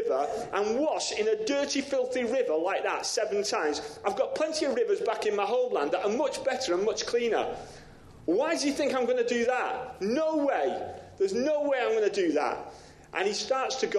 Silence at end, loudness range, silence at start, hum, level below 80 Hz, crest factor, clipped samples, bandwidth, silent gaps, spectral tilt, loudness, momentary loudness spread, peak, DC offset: 0 s; 1 LU; 0 s; none; -64 dBFS; 14 dB; under 0.1%; 12.5 kHz; none; -3 dB/octave; -28 LUFS; 6 LU; -14 dBFS; under 0.1%